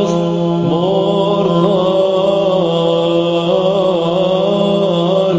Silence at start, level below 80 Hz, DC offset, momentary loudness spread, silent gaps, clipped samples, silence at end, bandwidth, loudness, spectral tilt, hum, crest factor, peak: 0 s; -50 dBFS; under 0.1%; 2 LU; none; under 0.1%; 0 s; 8 kHz; -14 LUFS; -7.5 dB/octave; none; 12 dB; 0 dBFS